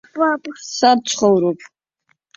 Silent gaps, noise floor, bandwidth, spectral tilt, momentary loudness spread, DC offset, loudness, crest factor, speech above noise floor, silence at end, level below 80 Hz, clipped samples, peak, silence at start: none; -66 dBFS; 8.2 kHz; -4 dB/octave; 11 LU; under 0.1%; -17 LUFS; 16 dB; 49 dB; 0.8 s; -62 dBFS; under 0.1%; -2 dBFS; 0.15 s